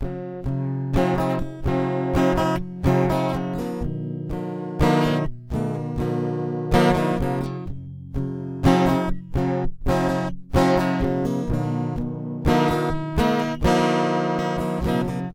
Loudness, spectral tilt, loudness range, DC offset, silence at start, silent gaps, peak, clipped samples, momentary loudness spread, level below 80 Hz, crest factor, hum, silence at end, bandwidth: -23 LUFS; -7 dB/octave; 2 LU; under 0.1%; 0 s; none; -2 dBFS; under 0.1%; 10 LU; -34 dBFS; 20 dB; none; 0 s; 16.5 kHz